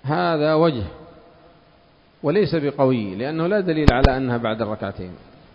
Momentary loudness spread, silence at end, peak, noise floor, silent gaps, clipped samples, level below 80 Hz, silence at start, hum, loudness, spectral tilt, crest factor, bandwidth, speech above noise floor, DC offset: 13 LU; 0.4 s; 0 dBFS; -54 dBFS; none; under 0.1%; -32 dBFS; 0.05 s; none; -20 LUFS; -8 dB/octave; 22 dB; 8 kHz; 34 dB; under 0.1%